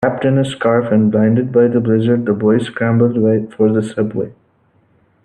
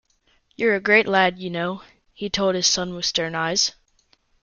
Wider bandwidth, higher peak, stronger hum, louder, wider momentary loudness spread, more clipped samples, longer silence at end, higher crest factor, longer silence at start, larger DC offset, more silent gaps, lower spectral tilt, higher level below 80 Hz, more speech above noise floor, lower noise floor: second, 9.4 kHz vs 11 kHz; about the same, 0 dBFS vs -2 dBFS; neither; first, -15 LUFS vs -21 LUFS; second, 6 LU vs 11 LU; neither; first, 0.95 s vs 0.75 s; second, 14 dB vs 20 dB; second, 0 s vs 0.6 s; neither; neither; first, -8.5 dB/octave vs -2.5 dB/octave; about the same, -56 dBFS vs -56 dBFS; about the same, 42 dB vs 42 dB; second, -56 dBFS vs -63 dBFS